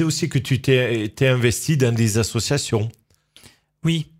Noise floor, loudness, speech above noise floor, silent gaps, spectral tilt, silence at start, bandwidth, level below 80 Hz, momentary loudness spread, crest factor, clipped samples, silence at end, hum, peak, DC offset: -52 dBFS; -20 LUFS; 32 dB; none; -5 dB/octave; 0 s; 16 kHz; -48 dBFS; 5 LU; 18 dB; under 0.1%; 0.15 s; none; -4 dBFS; under 0.1%